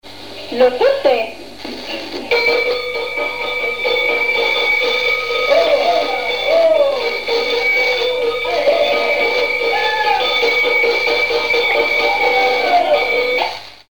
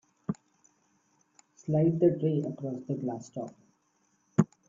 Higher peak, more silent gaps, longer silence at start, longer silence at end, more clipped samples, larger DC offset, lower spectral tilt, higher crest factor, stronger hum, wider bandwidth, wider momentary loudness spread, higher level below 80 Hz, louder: first, -2 dBFS vs -8 dBFS; neither; second, 0 s vs 0.3 s; second, 0 s vs 0.25 s; neither; first, 1% vs under 0.1%; second, -2 dB/octave vs -9 dB/octave; second, 14 dB vs 24 dB; neither; first, over 20 kHz vs 7.6 kHz; second, 7 LU vs 16 LU; first, -54 dBFS vs -70 dBFS; first, -15 LUFS vs -31 LUFS